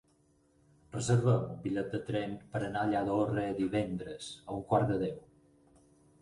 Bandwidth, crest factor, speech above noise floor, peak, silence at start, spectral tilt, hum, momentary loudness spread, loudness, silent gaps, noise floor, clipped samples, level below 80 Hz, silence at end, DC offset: 11.5 kHz; 18 dB; 37 dB; -16 dBFS; 0.95 s; -6.5 dB/octave; none; 12 LU; -33 LUFS; none; -69 dBFS; under 0.1%; -60 dBFS; 1.05 s; under 0.1%